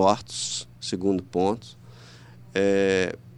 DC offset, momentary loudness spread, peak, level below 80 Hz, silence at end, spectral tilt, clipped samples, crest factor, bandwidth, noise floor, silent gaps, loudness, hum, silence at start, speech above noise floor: under 0.1%; 10 LU; -6 dBFS; -60 dBFS; 0.05 s; -4.5 dB/octave; under 0.1%; 20 dB; 11 kHz; -47 dBFS; none; -25 LUFS; 60 Hz at -45 dBFS; 0 s; 23 dB